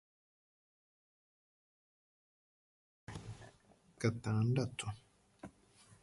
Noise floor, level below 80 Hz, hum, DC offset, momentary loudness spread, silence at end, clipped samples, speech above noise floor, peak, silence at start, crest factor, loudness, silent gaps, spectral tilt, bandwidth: -68 dBFS; -68 dBFS; none; under 0.1%; 22 LU; 0.1 s; under 0.1%; 32 dB; -20 dBFS; 3.1 s; 24 dB; -38 LUFS; none; -6.5 dB/octave; 11.5 kHz